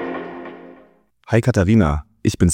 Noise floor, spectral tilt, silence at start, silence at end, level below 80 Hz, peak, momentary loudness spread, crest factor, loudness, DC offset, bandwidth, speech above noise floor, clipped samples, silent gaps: -52 dBFS; -6.5 dB/octave; 0 s; 0 s; -34 dBFS; -2 dBFS; 18 LU; 18 dB; -18 LUFS; under 0.1%; 15.5 kHz; 37 dB; under 0.1%; none